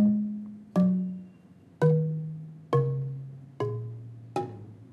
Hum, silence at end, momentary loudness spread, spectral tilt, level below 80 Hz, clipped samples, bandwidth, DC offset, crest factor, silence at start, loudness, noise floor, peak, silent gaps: none; 0 s; 17 LU; -10 dB/octave; -68 dBFS; under 0.1%; 9.8 kHz; under 0.1%; 18 dB; 0 s; -29 LUFS; -54 dBFS; -12 dBFS; none